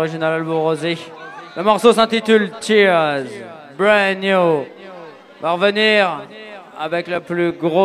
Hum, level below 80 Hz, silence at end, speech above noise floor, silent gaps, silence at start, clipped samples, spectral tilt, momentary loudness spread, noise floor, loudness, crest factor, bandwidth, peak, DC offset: none; -64 dBFS; 0 s; 21 dB; none; 0 s; under 0.1%; -5 dB/octave; 21 LU; -37 dBFS; -16 LUFS; 16 dB; 13.5 kHz; 0 dBFS; under 0.1%